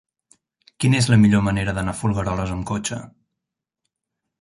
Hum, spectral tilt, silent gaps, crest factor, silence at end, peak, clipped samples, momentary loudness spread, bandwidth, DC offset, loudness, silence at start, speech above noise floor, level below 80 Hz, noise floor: none; -5.5 dB/octave; none; 18 dB; 1.3 s; -4 dBFS; under 0.1%; 11 LU; 11.5 kHz; under 0.1%; -20 LUFS; 0.8 s; 65 dB; -42 dBFS; -84 dBFS